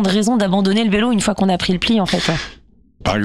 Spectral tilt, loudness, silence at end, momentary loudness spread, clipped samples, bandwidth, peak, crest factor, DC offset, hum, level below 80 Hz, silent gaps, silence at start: -5 dB/octave; -17 LUFS; 0 s; 7 LU; under 0.1%; 13 kHz; -4 dBFS; 12 dB; under 0.1%; none; -38 dBFS; none; 0 s